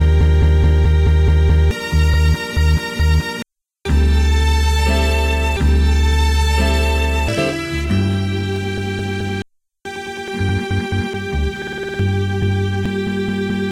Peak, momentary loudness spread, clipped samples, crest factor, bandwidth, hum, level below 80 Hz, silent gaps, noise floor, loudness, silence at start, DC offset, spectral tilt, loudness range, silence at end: -4 dBFS; 10 LU; under 0.1%; 12 dB; 12.5 kHz; none; -18 dBFS; none; -35 dBFS; -17 LUFS; 0 s; under 0.1%; -6 dB/octave; 6 LU; 0 s